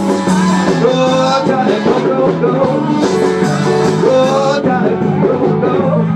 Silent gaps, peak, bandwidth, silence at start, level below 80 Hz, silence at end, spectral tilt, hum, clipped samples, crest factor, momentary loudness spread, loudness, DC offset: none; 0 dBFS; 11.5 kHz; 0 s; -50 dBFS; 0 s; -6.5 dB/octave; none; under 0.1%; 12 dB; 2 LU; -12 LUFS; under 0.1%